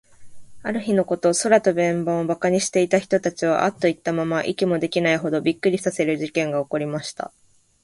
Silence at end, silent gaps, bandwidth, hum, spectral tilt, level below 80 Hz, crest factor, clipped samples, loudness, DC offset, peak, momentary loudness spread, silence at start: 0.55 s; none; 11.5 kHz; none; -5 dB/octave; -62 dBFS; 18 dB; under 0.1%; -21 LUFS; under 0.1%; -2 dBFS; 9 LU; 0.2 s